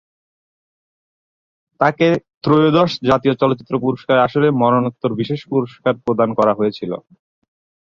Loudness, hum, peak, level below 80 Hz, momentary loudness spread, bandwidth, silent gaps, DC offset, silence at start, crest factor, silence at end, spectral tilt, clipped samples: -17 LUFS; none; -2 dBFS; -56 dBFS; 7 LU; 7.4 kHz; 2.37-2.41 s; under 0.1%; 1.8 s; 16 dB; 0.85 s; -8 dB/octave; under 0.1%